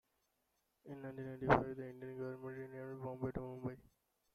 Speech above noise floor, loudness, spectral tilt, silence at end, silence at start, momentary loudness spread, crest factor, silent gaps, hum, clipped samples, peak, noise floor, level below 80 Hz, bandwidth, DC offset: 42 dB; -42 LUFS; -8.5 dB/octave; 0.5 s; 0.85 s; 15 LU; 28 dB; none; none; under 0.1%; -16 dBFS; -83 dBFS; -64 dBFS; 13.5 kHz; under 0.1%